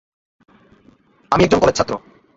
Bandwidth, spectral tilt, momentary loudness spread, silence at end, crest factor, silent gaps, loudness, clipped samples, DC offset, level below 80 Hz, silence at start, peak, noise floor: 8 kHz; -5 dB/octave; 10 LU; 0.4 s; 20 dB; none; -16 LUFS; under 0.1%; under 0.1%; -42 dBFS; 1.3 s; 0 dBFS; -53 dBFS